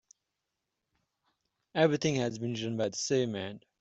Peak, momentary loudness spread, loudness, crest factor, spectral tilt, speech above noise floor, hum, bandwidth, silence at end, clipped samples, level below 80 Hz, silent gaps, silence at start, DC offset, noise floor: -10 dBFS; 11 LU; -31 LUFS; 22 dB; -5 dB/octave; 55 dB; none; 8.2 kHz; 0.25 s; under 0.1%; -72 dBFS; none; 1.75 s; under 0.1%; -86 dBFS